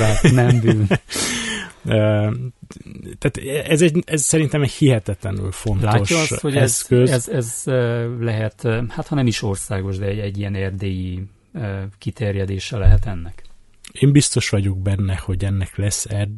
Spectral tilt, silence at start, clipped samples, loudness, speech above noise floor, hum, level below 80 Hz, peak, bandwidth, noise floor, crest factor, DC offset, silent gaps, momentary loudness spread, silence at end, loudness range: -5.5 dB/octave; 0 s; under 0.1%; -19 LUFS; 23 dB; none; -30 dBFS; 0 dBFS; 12 kHz; -42 dBFS; 18 dB; under 0.1%; none; 12 LU; 0 s; 6 LU